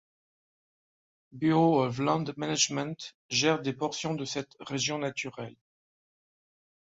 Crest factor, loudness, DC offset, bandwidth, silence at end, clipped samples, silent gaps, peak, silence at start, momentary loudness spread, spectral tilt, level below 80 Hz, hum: 22 dB; -29 LUFS; under 0.1%; 8 kHz; 1.3 s; under 0.1%; 3.14-3.29 s; -10 dBFS; 1.35 s; 13 LU; -4 dB/octave; -70 dBFS; none